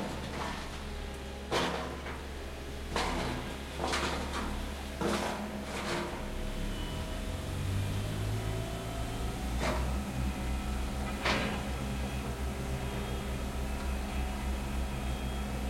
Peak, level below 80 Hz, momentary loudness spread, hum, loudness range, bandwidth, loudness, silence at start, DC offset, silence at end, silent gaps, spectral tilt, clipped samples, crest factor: -16 dBFS; -40 dBFS; 7 LU; none; 2 LU; 16.5 kHz; -36 LUFS; 0 s; under 0.1%; 0 s; none; -5 dB/octave; under 0.1%; 20 dB